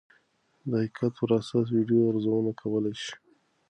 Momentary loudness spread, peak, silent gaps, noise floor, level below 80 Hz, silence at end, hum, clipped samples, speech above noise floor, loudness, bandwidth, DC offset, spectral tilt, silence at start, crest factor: 13 LU; -12 dBFS; none; -68 dBFS; -68 dBFS; 0.55 s; none; under 0.1%; 42 dB; -27 LUFS; 9.2 kHz; under 0.1%; -7.5 dB/octave; 0.65 s; 16 dB